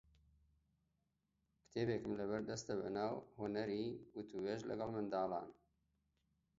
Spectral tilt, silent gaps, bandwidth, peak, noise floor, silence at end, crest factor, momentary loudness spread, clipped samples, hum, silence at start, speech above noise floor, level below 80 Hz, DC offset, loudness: -5.5 dB/octave; none; 7.6 kHz; -28 dBFS; -86 dBFS; 1.05 s; 18 dB; 7 LU; under 0.1%; none; 1.75 s; 43 dB; -74 dBFS; under 0.1%; -44 LUFS